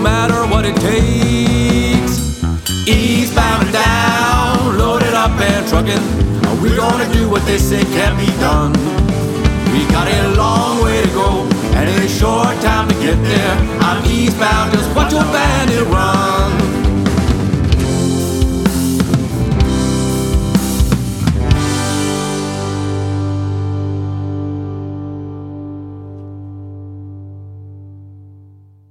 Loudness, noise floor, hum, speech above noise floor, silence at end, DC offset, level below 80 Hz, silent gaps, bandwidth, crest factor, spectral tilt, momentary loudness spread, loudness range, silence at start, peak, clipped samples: -14 LUFS; -42 dBFS; 50 Hz at -40 dBFS; 30 dB; 0.55 s; under 0.1%; -22 dBFS; none; 17 kHz; 14 dB; -5.5 dB/octave; 12 LU; 9 LU; 0 s; 0 dBFS; under 0.1%